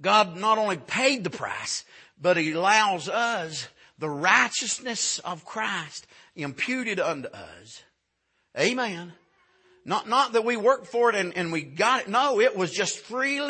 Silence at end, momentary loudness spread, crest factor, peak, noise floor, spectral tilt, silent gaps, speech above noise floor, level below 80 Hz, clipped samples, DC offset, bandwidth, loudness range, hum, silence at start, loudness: 0 s; 15 LU; 22 dB; -4 dBFS; -74 dBFS; -2.5 dB/octave; none; 49 dB; -74 dBFS; under 0.1%; under 0.1%; 8.8 kHz; 7 LU; none; 0 s; -25 LUFS